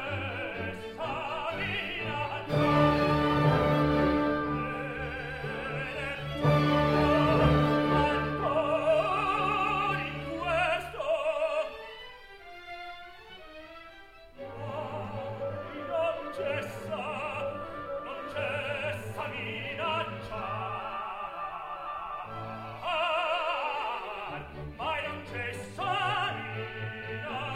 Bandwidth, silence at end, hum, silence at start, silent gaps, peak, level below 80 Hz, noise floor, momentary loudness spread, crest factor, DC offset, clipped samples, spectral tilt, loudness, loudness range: 14.5 kHz; 0 s; none; 0 s; none; -10 dBFS; -48 dBFS; -51 dBFS; 15 LU; 20 dB; under 0.1%; under 0.1%; -6.5 dB/octave; -30 LUFS; 10 LU